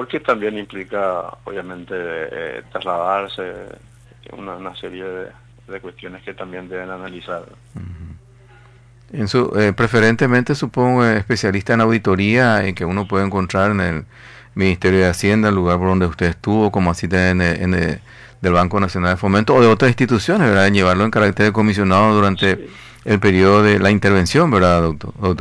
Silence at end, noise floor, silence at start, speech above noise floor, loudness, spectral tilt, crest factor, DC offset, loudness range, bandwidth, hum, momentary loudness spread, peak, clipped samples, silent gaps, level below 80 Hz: 0 s; -46 dBFS; 0 s; 29 dB; -16 LUFS; -6.5 dB/octave; 14 dB; under 0.1%; 17 LU; 11 kHz; none; 18 LU; -2 dBFS; under 0.1%; none; -42 dBFS